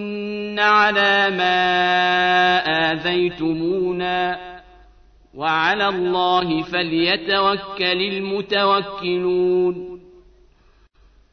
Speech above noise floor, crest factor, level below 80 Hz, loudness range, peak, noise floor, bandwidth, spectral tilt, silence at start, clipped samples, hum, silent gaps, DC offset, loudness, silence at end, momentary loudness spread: 36 dB; 16 dB; -52 dBFS; 5 LU; -4 dBFS; -54 dBFS; 6.6 kHz; -5.5 dB/octave; 0 s; under 0.1%; none; none; under 0.1%; -18 LUFS; 1.35 s; 9 LU